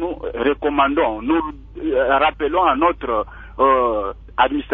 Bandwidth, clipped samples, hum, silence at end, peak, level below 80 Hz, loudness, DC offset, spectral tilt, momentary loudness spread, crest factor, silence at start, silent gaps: 4.1 kHz; under 0.1%; none; 0 s; -2 dBFS; -40 dBFS; -19 LUFS; under 0.1%; -8 dB/octave; 10 LU; 18 dB; 0 s; none